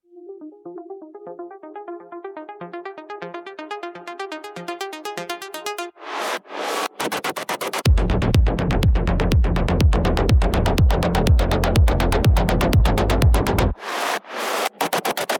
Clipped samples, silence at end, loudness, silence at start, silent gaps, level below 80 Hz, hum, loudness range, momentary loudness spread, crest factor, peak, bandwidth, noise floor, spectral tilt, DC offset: under 0.1%; 0 s; -21 LUFS; 0.15 s; none; -24 dBFS; none; 16 LU; 18 LU; 18 dB; -2 dBFS; 19 kHz; -39 dBFS; -5.5 dB/octave; under 0.1%